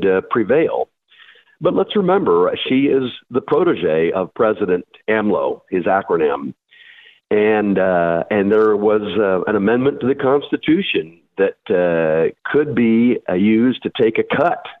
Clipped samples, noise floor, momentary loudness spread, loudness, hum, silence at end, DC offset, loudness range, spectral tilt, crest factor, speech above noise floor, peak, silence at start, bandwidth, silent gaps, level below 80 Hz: under 0.1%; -48 dBFS; 6 LU; -17 LUFS; none; 0.1 s; under 0.1%; 2 LU; -9 dB/octave; 14 dB; 32 dB; -4 dBFS; 0 s; 4.1 kHz; none; -56 dBFS